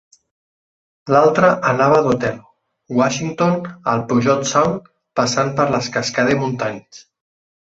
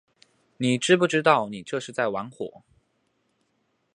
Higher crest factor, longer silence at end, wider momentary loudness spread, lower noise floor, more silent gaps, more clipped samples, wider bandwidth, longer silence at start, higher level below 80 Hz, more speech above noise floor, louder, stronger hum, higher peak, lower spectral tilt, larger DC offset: second, 16 dB vs 24 dB; second, 0.75 s vs 1.45 s; second, 11 LU vs 16 LU; first, under -90 dBFS vs -72 dBFS; neither; neither; second, 8 kHz vs 11 kHz; first, 1.05 s vs 0.6 s; first, -54 dBFS vs -72 dBFS; first, over 73 dB vs 48 dB; first, -17 LUFS vs -24 LUFS; neither; about the same, -2 dBFS vs -2 dBFS; about the same, -5 dB/octave vs -4.5 dB/octave; neither